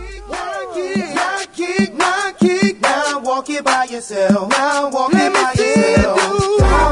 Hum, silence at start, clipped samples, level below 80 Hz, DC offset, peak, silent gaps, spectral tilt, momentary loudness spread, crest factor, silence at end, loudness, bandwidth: none; 0 s; under 0.1%; -28 dBFS; under 0.1%; -2 dBFS; none; -4.5 dB/octave; 9 LU; 14 dB; 0 s; -16 LUFS; 11 kHz